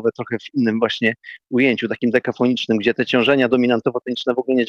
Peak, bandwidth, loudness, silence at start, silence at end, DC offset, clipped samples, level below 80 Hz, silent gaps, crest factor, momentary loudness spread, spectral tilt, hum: -2 dBFS; 7.2 kHz; -19 LUFS; 0 s; 0 s; under 0.1%; under 0.1%; -60 dBFS; none; 16 dB; 7 LU; -6 dB/octave; none